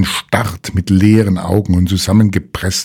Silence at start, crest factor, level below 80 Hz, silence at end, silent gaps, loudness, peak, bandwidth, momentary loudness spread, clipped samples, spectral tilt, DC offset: 0 s; 12 dB; -34 dBFS; 0 s; none; -13 LUFS; 0 dBFS; 16.5 kHz; 8 LU; 0.4%; -5.5 dB/octave; under 0.1%